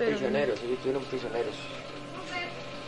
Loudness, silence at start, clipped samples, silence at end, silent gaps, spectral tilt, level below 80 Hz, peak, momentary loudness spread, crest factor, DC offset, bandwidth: -32 LUFS; 0 s; under 0.1%; 0 s; none; -5 dB/octave; -58 dBFS; -14 dBFS; 12 LU; 18 dB; under 0.1%; 11 kHz